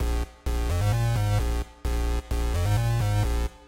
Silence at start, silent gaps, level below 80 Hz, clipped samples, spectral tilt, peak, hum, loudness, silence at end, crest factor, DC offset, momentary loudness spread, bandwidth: 0 s; none; -28 dBFS; under 0.1%; -6 dB/octave; -14 dBFS; none; -27 LUFS; 0.1 s; 10 dB; under 0.1%; 7 LU; 16 kHz